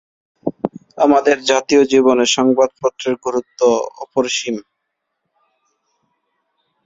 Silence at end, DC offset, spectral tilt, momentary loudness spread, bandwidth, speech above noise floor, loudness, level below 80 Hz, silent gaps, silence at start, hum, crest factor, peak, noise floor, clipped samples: 2.25 s; under 0.1%; -3 dB/octave; 13 LU; 7.8 kHz; 60 dB; -16 LUFS; -60 dBFS; none; 0.45 s; none; 18 dB; 0 dBFS; -75 dBFS; under 0.1%